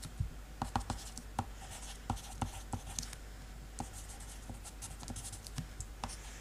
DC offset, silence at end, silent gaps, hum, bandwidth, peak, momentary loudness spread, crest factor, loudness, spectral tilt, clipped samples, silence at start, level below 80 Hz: under 0.1%; 0 s; none; none; 15.5 kHz; -16 dBFS; 8 LU; 28 dB; -44 LUFS; -4 dB/octave; under 0.1%; 0 s; -48 dBFS